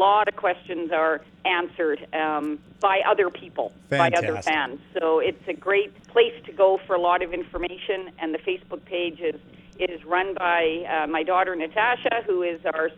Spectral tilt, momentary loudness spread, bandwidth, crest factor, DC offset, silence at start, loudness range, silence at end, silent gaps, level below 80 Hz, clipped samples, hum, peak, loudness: -5 dB/octave; 9 LU; 10 kHz; 18 dB; under 0.1%; 0 s; 4 LU; 0 s; none; -56 dBFS; under 0.1%; none; -6 dBFS; -24 LUFS